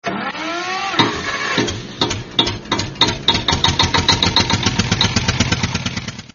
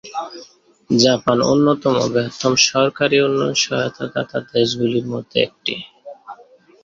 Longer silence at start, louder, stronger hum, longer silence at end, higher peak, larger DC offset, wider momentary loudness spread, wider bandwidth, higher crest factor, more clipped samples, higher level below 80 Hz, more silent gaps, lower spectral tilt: about the same, 0.05 s vs 0.05 s; about the same, -17 LUFS vs -17 LUFS; neither; second, 0.1 s vs 0.5 s; about the same, 0 dBFS vs 0 dBFS; neither; second, 9 LU vs 15 LU; about the same, 7.4 kHz vs 7.8 kHz; about the same, 18 dB vs 18 dB; neither; first, -36 dBFS vs -56 dBFS; neither; second, -2.5 dB/octave vs -4 dB/octave